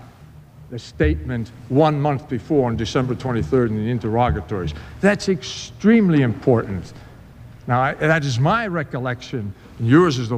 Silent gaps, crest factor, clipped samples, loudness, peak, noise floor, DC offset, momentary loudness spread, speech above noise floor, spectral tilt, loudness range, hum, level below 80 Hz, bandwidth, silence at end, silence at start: none; 18 dB; under 0.1%; -20 LUFS; -2 dBFS; -44 dBFS; under 0.1%; 14 LU; 24 dB; -7 dB/octave; 2 LU; none; -38 dBFS; 9.6 kHz; 0 s; 0 s